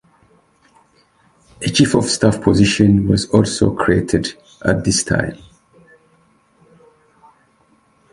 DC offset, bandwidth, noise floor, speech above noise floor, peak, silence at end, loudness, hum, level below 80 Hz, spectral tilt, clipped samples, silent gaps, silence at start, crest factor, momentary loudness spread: under 0.1%; 11.5 kHz; -57 dBFS; 42 dB; 0 dBFS; 2.75 s; -16 LUFS; none; -38 dBFS; -5 dB/octave; under 0.1%; none; 1.6 s; 18 dB; 8 LU